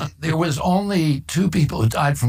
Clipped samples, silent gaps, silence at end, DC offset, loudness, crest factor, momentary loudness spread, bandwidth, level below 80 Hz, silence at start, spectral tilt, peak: under 0.1%; none; 0 s; under 0.1%; -20 LUFS; 14 dB; 2 LU; 16 kHz; -42 dBFS; 0 s; -6 dB/octave; -6 dBFS